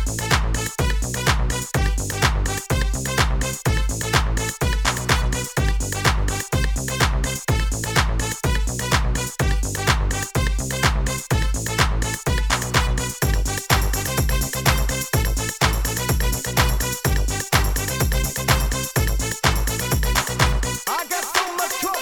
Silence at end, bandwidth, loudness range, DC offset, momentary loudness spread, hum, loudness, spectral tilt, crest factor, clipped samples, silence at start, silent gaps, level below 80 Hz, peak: 0 s; 19 kHz; 1 LU; 0.2%; 3 LU; none; -21 LUFS; -3.5 dB/octave; 18 dB; under 0.1%; 0 s; none; -24 dBFS; -2 dBFS